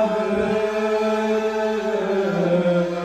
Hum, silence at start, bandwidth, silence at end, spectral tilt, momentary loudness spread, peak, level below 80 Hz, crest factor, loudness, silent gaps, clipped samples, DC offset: none; 0 s; 13 kHz; 0 s; -6.5 dB/octave; 3 LU; -8 dBFS; -52 dBFS; 12 dB; -21 LUFS; none; under 0.1%; under 0.1%